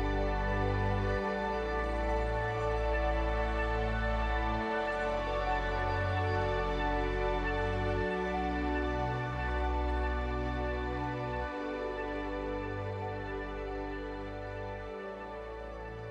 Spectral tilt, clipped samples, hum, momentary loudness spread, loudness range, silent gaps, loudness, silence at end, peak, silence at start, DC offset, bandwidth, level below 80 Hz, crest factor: -7 dB/octave; under 0.1%; none; 9 LU; 6 LU; none; -34 LUFS; 0 s; -18 dBFS; 0 s; under 0.1%; 8.2 kHz; -38 dBFS; 14 dB